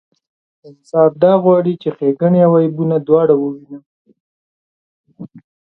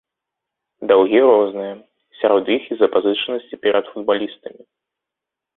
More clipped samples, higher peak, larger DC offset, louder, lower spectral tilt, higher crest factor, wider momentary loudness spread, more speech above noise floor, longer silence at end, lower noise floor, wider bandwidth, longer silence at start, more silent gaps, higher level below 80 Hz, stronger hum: neither; about the same, 0 dBFS vs -2 dBFS; neither; first, -13 LUFS vs -17 LUFS; first, -10.5 dB/octave vs -9 dB/octave; about the same, 16 dB vs 18 dB; second, 9 LU vs 16 LU; first, over 77 dB vs 68 dB; second, 0.35 s vs 1.1 s; first, under -90 dBFS vs -85 dBFS; first, 5.8 kHz vs 4.1 kHz; second, 0.65 s vs 0.8 s; first, 3.86-4.05 s, 4.20-5.04 s vs none; about the same, -62 dBFS vs -64 dBFS; neither